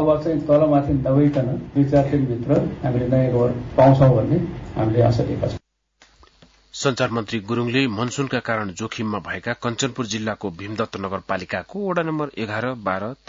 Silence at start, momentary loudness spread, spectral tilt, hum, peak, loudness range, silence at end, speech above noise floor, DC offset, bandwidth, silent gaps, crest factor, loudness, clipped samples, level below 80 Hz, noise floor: 0 s; 11 LU; -6.5 dB/octave; none; -4 dBFS; 7 LU; 0.15 s; 38 dB; under 0.1%; 7.6 kHz; none; 16 dB; -21 LUFS; under 0.1%; -44 dBFS; -58 dBFS